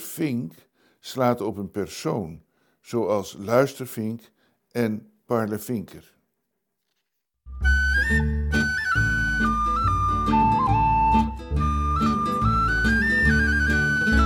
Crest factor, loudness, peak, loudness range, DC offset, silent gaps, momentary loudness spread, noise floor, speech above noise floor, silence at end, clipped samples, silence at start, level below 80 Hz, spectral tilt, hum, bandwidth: 18 dB; -23 LUFS; -4 dBFS; 8 LU; under 0.1%; none; 12 LU; -79 dBFS; 53 dB; 0 s; under 0.1%; 0 s; -32 dBFS; -6 dB/octave; none; 18 kHz